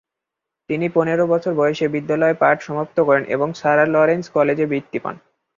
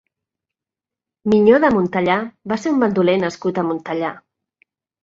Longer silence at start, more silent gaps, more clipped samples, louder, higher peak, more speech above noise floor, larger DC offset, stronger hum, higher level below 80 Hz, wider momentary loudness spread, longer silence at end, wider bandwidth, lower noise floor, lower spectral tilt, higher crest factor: second, 0.7 s vs 1.25 s; neither; neither; about the same, -18 LUFS vs -18 LUFS; about the same, -2 dBFS vs -2 dBFS; second, 65 dB vs 71 dB; neither; neither; second, -62 dBFS vs -56 dBFS; second, 8 LU vs 11 LU; second, 0.45 s vs 0.85 s; about the same, 7.4 kHz vs 7.6 kHz; second, -83 dBFS vs -88 dBFS; about the same, -7 dB/octave vs -7 dB/octave; about the same, 16 dB vs 18 dB